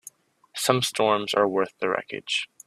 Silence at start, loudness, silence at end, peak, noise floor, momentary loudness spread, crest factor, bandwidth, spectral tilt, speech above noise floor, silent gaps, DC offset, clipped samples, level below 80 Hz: 0.05 s; -24 LUFS; 0.2 s; -2 dBFS; -50 dBFS; 6 LU; 24 dB; 15.5 kHz; -3.5 dB/octave; 26 dB; none; under 0.1%; under 0.1%; -68 dBFS